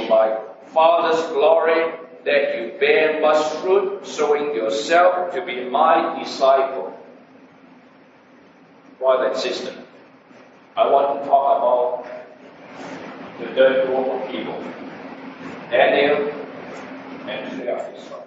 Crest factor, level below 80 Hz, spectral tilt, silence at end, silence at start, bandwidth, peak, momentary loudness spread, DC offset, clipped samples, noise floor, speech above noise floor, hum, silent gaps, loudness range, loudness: 18 dB; -74 dBFS; -1.5 dB/octave; 0 s; 0 s; 8 kHz; -2 dBFS; 19 LU; under 0.1%; under 0.1%; -49 dBFS; 31 dB; none; none; 6 LU; -19 LUFS